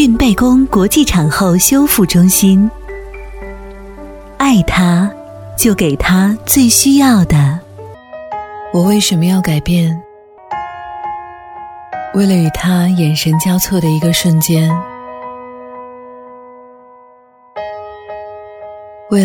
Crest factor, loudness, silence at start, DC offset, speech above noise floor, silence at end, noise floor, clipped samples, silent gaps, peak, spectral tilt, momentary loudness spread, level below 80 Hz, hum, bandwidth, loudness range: 12 dB; -11 LUFS; 0 s; under 0.1%; 34 dB; 0 s; -45 dBFS; under 0.1%; none; 0 dBFS; -5 dB/octave; 22 LU; -32 dBFS; none; 19 kHz; 12 LU